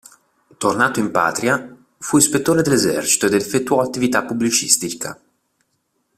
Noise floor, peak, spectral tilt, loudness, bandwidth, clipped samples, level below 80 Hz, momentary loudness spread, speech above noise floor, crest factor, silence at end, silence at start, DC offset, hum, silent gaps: -69 dBFS; 0 dBFS; -3 dB/octave; -17 LUFS; 16 kHz; under 0.1%; -56 dBFS; 8 LU; 51 dB; 20 dB; 1.05 s; 0.6 s; under 0.1%; none; none